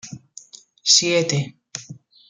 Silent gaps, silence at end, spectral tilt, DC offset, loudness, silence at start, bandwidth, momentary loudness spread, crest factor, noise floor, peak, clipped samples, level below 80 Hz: none; 0.35 s; -2.5 dB/octave; under 0.1%; -17 LUFS; 0.05 s; 11 kHz; 22 LU; 22 dB; -45 dBFS; -2 dBFS; under 0.1%; -66 dBFS